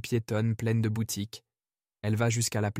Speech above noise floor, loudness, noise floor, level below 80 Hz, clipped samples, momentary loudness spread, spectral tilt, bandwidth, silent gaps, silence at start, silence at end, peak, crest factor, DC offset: over 61 dB; -29 LUFS; under -90 dBFS; -64 dBFS; under 0.1%; 10 LU; -5.5 dB/octave; 16 kHz; none; 0.05 s; 0 s; -16 dBFS; 14 dB; under 0.1%